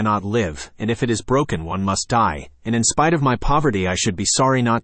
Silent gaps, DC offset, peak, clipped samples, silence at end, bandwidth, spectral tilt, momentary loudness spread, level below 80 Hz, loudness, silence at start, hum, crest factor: none; under 0.1%; -4 dBFS; under 0.1%; 0.05 s; 8.8 kHz; -4.5 dB/octave; 7 LU; -36 dBFS; -19 LUFS; 0 s; none; 14 dB